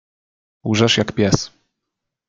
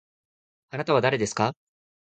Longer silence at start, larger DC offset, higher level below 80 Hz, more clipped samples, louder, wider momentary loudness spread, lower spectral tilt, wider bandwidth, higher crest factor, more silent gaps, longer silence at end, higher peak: about the same, 0.65 s vs 0.75 s; neither; first, -48 dBFS vs -64 dBFS; neither; first, -17 LUFS vs -25 LUFS; first, 14 LU vs 11 LU; about the same, -4.5 dB/octave vs -5 dB/octave; about the same, 9.4 kHz vs 9.4 kHz; about the same, 20 dB vs 20 dB; neither; first, 0.8 s vs 0.65 s; first, 0 dBFS vs -8 dBFS